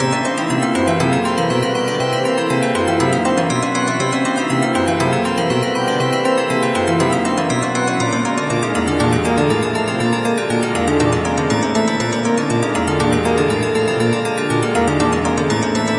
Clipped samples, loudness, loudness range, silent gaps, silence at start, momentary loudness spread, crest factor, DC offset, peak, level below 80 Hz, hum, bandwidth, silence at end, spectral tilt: under 0.1%; -17 LUFS; 0 LU; none; 0 s; 2 LU; 14 dB; under 0.1%; -2 dBFS; -44 dBFS; none; 11.5 kHz; 0 s; -5 dB/octave